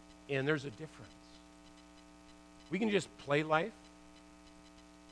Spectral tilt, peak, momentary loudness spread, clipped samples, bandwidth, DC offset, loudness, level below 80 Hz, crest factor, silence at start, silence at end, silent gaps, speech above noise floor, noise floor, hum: -5.5 dB/octave; -16 dBFS; 24 LU; under 0.1%; 11 kHz; under 0.1%; -35 LUFS; -68 dBFS; 24 dB; 0.1 s; 0 s; none; 23 dB; -58 dBFS; none